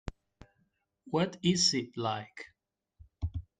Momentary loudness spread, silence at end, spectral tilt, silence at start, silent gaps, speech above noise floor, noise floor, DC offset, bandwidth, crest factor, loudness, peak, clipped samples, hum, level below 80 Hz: 22 LU; 0.2 s; -4 dB/octave; 0.05 s; none; 45 dB; -76 dBFS; under 0.1%; 9.6 kHz; 20 dB; -31 LUFS; -14 dBFS; under 0.1%; none; -52 dBFS